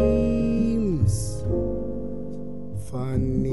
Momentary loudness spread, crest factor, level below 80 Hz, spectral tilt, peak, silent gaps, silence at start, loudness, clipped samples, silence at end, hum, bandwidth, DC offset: 12 LU; 14 dB; -34 dBFS; -8 dB/octave; -10 dBFS; none; 0 s; -26 LUFS; under 0.1%; 0 s; none; 11.5 kHz; 2%